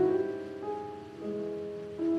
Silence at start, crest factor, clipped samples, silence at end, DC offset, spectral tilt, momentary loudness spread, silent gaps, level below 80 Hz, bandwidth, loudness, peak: 0 s; 16 dB; under 0.1%; 0 s; under 0.1%; -8 dB/octave; 9 LU; none; -72 dBFS; 8.8 kHz; -36 LUFS; -18 dBFS